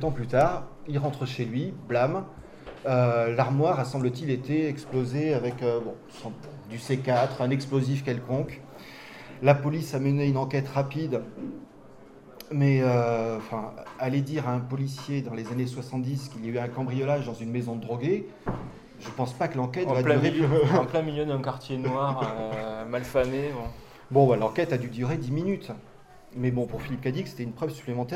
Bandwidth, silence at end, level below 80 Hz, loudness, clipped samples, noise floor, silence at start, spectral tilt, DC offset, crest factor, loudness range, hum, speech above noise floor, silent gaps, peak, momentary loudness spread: 13.5 kHz; 0 s; -54 dBFS; -28 LUFS; under 0.1%; -49 dBFS; 0 s; -7.5 dB/octave; under 0.1%; 22 dB; 5 LU; none; 22 dB; none; -6 dBFS; 16 LU